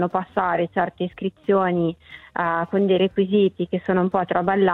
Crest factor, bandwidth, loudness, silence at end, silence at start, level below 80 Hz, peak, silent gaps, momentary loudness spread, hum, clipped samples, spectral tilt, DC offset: 16 dB; 4.1 kHz; -22 LUFS; 0 s; 0 s; -58 dBFS; -4 dBFS; none; 8 LU; none; under 0.1%; -9.5 dB/octave; under 0.1%